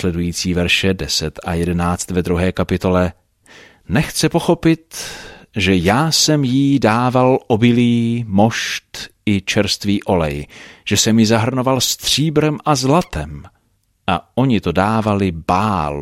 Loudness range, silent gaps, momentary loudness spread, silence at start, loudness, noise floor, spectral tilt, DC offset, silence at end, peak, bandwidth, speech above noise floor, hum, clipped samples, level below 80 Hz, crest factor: 4 LU; none; 11 LU; 0 s; -16 LUFS; -62 dBFS; -4.5 dB/octave; under 0.1%; 0 s; -2 dBFS; 16 kHz; 46 dB; none; under 0.1%; -38 dBFS; 16 dB